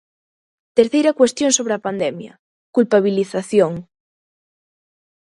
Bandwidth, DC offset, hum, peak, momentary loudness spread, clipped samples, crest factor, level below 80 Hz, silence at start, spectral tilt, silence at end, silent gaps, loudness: 11.5 kHz; under 0.1%; none; 0 dBFS; 9 LU; under 0.1%; 20 dB; -64 dBFS; 0.75 s; -4 dB/octave; 1.4 s; 2.39-2.73 s; -17 LUFS